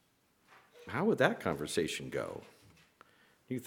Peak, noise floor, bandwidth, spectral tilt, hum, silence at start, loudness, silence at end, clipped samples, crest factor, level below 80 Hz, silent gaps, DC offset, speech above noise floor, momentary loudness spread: -10 dBFS; -71 dBFS; 18 kHz; -5 dB/octave; none; 0.5 s; -34 LUFS; 0 s; under 0.1%; 26 dB; -68 dBFS; none; under 0.1%; 38 dB; 15 LU